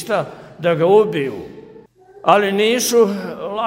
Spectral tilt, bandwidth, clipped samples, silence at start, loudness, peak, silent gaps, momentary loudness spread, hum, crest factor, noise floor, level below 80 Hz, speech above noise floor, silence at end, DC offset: -4 dB/octave; 16 kHz; under 0.1%; 0 s; -16 LUFS; 0 dBFS; none; 14 LU; none; 18 dB; -44 dBFS; -60 dBFS; 28 dB; 0 s; under 0.1%